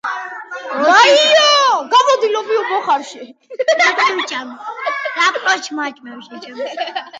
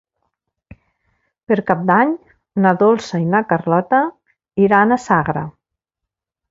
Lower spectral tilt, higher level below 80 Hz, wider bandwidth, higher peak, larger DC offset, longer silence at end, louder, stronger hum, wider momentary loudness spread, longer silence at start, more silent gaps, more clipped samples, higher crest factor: second, 0 dB/octave vs -7.5 dB/octave; second, -76 dBFS vs -54 dBFS; first, 9.4 kHz vs 7.8 kHz; about the same, 0 dBFS vs 0 dBFS; neither; second, 0 s vs 1 s; about the same, -14 LUFS vs -16 LUFS; neither; first, 19 LU vs 12 LU; second, 0.05 s vs 1.5 s; neither; neither; about the same, 16 dB vs 18 dB